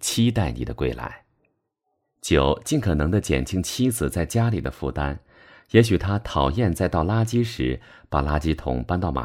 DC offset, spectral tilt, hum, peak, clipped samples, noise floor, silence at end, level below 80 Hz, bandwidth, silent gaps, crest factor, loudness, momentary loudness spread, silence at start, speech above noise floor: under 0.1%; -6 dB/octave; none; -2 dBFS; under 0.1%; -76 dBFS; 0 s; -34 dBFS; 16.5 kHz; none; 20 dB; -23 LUFS; 8 LU; 0 s; 53 dB